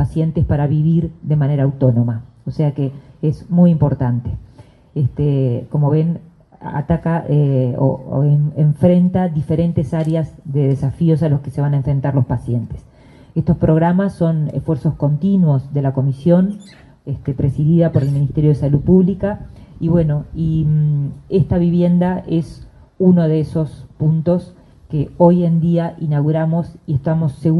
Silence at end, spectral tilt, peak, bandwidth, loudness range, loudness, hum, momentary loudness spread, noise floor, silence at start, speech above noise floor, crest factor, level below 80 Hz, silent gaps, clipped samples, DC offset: 0 s; -10.5 dB/octave; 0 dBFS; 4.8 kHz; 2 LU; -17 LUFS; none; 9 LU; -44 dBFS; 0 s; 29 dB; 16 dB; -38 dBFS; none; under 0.1%; under 0.1%